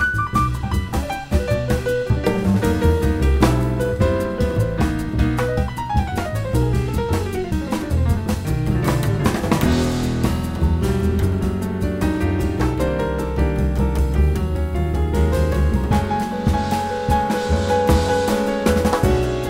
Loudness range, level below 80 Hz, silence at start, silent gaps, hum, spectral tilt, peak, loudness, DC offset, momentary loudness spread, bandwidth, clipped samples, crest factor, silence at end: 2 LU; -24 dBFS; 0 s; none; none; -6.5 dB/octave; -2 dBFS; -20 LUFS; under 0.1%; 5 LU; 16 kHz; under 0.1%; 18 dB; 0 s